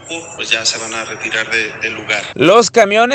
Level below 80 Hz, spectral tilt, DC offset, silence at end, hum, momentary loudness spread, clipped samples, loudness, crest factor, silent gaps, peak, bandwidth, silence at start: -56 dBFS; -2.5 dB/octave; under 0.1%; 0 s; none; 12 LU; 0.1%; -14 LUFS; 14 dB; none; 0 dBFS; 11.5 kHz; 0 s